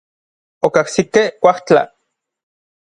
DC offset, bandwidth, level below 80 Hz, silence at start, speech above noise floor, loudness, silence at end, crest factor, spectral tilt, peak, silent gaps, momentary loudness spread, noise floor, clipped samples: under 0.1%; 11 kHz; -56 dBFS; 0.65 s; 58 dB; -15 LUFS; 1.05 s; 18 dB; -4.5 dB/octave; 0 dBFS; none; 6 LU; -72 dBFS; under 0.1%